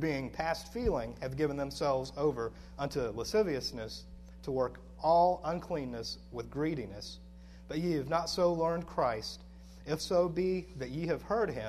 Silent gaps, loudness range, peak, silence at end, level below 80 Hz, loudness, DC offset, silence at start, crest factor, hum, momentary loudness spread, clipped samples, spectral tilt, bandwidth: none; 2 LU; -16 dBFS; 0 s; -52 dBFS; -34 LUFS; under 0.1%; 0 s; 18 dB; none; 14 LU; under 0.1%; -5.5 dB/octave; 13.5 kHz